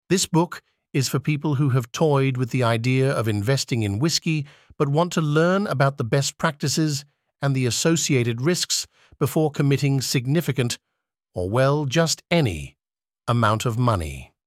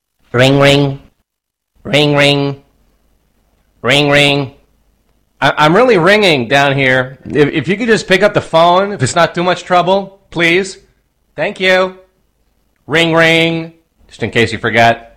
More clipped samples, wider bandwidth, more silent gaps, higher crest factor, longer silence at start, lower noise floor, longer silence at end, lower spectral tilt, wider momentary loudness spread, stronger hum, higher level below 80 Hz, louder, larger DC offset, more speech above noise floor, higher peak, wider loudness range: neither; about the same, 16 kHz vs 16 kHz; neither; first, 18 dB vs 12 dB; second, 0.1 s vs 0.35 s; first, under -90 dBFS vs -76 dBFS; about the same, 0.2 s vs 0.15 s; about the same, -5 dB/octave vs -5 dB/octave; second, 8 LU vs 12 LU; neither; second, -50 dBFS vs -44 dBFS; second, -22 LUFS vs -11 LUFS; neither; first, over 69 dB vs 65 dB; second, -4 dBFS vs 0 dBFS; about the same, 2 LU vs 4 LU